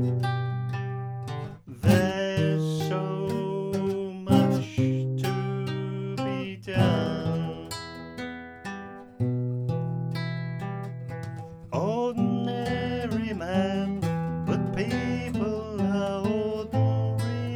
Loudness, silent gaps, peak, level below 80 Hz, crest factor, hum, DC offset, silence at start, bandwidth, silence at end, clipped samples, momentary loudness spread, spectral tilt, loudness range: -28 LUFS; none; -8 dBFS; -52 dBFS; 20 dB; none; under 0.1%; 0 s; 17.5 kHz; 0 s; under 0.1%; 12 LU; -7.5 dB/octave; 6 LU